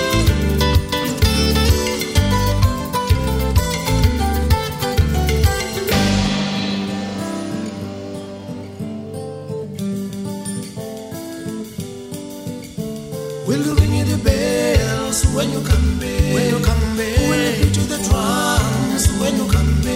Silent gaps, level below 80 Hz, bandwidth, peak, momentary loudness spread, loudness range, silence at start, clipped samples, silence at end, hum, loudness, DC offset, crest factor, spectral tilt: none; -24 dBFS; 16.5 kHz; -2 dBFS; 13 LU; 10 LU; 0 s; under 0.1%; 0 s; none; -18 LUFS; under 0.1%; 16 dB; -5 dB/octave